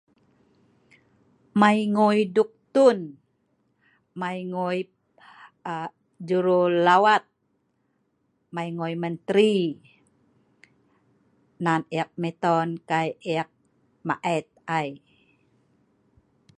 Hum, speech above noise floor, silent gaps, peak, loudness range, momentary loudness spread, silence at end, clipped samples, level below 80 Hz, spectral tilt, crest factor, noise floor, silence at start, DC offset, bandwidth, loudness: none; 49 dB; none; -4 dBFS; 7 LU; 16 LU; 1.6 s; under 0.1%; -74 dBFS; -6.5 dB/octave; 22 dB; -72 dBFS; 1.55 s; under 0.1%; 11 kHz; -24 LUFS